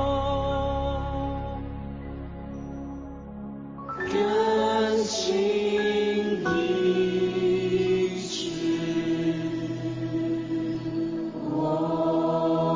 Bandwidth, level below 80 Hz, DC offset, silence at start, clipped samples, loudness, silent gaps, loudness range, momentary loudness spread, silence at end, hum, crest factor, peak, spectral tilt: 7.6 kHz; -42 dBFS; under 0.1%; 0 s; under 0.1%; -26 LUFS; none; 8 LU; 14 LU; 0 s; none; 14 dB; -12 dBFS; -5.5 dB/octave